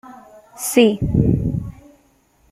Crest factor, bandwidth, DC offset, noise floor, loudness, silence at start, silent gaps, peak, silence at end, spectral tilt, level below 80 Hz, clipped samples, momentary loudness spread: 18 dB; 16 kHz; under 0.1%; -57 dBFS; -18 LUFS; 0.05 s; none; -2 dBFS; 0.8 s; -6 dB/octave; -34 dBFS; under 0.1%; 13 LU